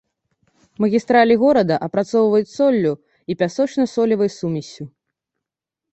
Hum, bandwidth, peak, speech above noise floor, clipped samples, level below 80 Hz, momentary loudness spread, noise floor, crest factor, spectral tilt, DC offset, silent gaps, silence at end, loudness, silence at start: none; 8.2 kHz; -2 dBFS; 68 dB; under 0.1%; -60 dBFS; 15 LU; -85 dBFS; 18 dB; -6.5 dB/octave; under 0.1%; none; 1.05 s; -18 LUFS; 0.8 s